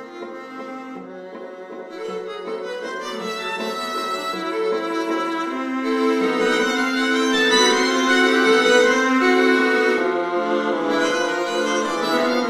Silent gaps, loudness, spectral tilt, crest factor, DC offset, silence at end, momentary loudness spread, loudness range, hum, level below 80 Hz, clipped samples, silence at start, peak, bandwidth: none; -19 LUFS; -2.5 dB/octave; 18 dB; under 0.1%; 0 s; 18 LU; 12 LU; none; -70 dBFS; under 0.1%; 0 s; -4 dBFS; 15 kHz